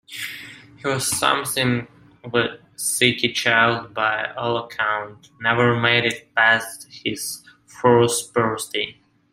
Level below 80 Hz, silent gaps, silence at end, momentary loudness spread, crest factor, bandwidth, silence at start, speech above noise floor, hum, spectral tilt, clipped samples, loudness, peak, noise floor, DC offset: -58 dBFS; none; 0.4 s; 13 LU; 20 dB; 16 kHz; 0.1 s; 19 dB; none; -3 dB/octave; under 0.1%; -20 LUFS; -2 dBFS; -40 dBFS; under 0.1%